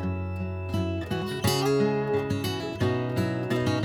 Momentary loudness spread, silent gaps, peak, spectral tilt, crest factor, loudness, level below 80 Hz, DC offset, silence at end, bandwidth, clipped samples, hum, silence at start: 7 LU; none; -10 dBFS; -6 dB/octave; 16 dB; -28 LUFS; -50 dBFS; under 0.1%; 0 s; 19 kHz; under 0.1%; none; 0 s